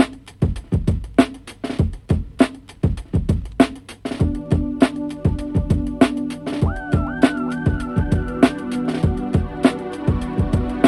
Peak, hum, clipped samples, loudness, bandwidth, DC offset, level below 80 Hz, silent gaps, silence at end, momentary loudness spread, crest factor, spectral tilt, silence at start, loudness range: 0 dBFS; none; under 0.1%; -21 LUFS; 12 kHz; under 0.1%; -30 dBFS; none; 0 s; 6 LU; 20 dB; -7.5 dB/octave; 0 s; 2 LU